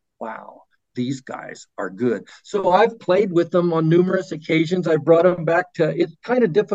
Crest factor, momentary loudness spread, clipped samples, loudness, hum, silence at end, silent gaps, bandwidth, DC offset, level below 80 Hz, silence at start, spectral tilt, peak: 18 dB; 17 LU; under 0.1%; -19 LUFS; none; 0 s; none; 8 kHz; under 0.1%; -66 dBFS; 0.2 s; -7 dB/octave; -2 dBFS